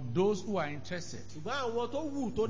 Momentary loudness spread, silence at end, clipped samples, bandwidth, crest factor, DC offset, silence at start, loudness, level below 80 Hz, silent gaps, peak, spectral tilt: 10 LU; 0 s; under 0.1%; 7.6 kHz; 14 dB; 0.8%; 0 s; -35 LUFS; -58 dBFS; none; -20 dBFS; -5.5 dB/octave